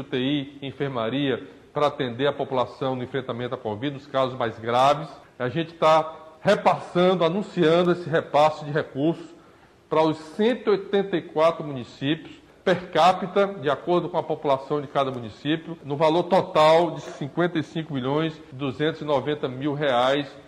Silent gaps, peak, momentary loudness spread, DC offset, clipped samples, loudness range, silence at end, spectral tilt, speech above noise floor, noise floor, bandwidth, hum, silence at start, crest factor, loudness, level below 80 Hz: none; -8 dBFS; 10 LU; under 0.1%; under 0.1%; 4 LU; 0.05 s; -6.5 dB/octave; 30 dB; -53 dBFS; 11 kHz; none; 0 s; 16 dB; -24 LUFS; -62 dBFS